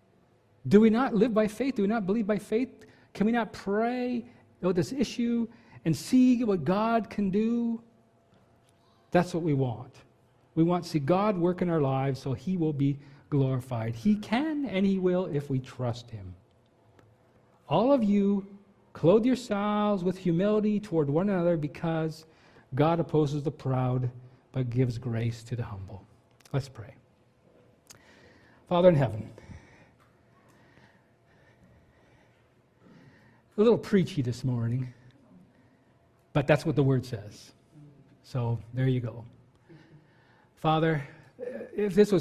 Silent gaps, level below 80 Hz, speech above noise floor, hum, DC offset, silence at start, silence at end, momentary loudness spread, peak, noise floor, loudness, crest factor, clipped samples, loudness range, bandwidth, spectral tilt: none; -58 dBFS; 37 dB; none; under 0.1%; 0.65 s; 0 s; 15 LU; -6 dBFS; -64 dBFS; -28 LUFS; 22 dB; under 0.1%; 6 LU; 13.5 kHz; -8 dB/octave